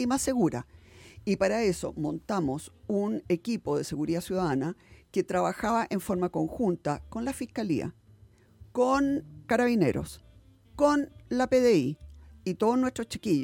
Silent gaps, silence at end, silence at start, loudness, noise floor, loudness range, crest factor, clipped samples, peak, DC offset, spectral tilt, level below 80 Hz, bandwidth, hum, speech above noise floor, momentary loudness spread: none; 0 s; 0 s; -29 LUFS; -57 dBFS; 3 LU; 18 dB; under 0.1%; -10 dBFS; under 0.1%; -6 dB/octave; -54 dBFS; 17 kHz; none; 29 dB; 11 LU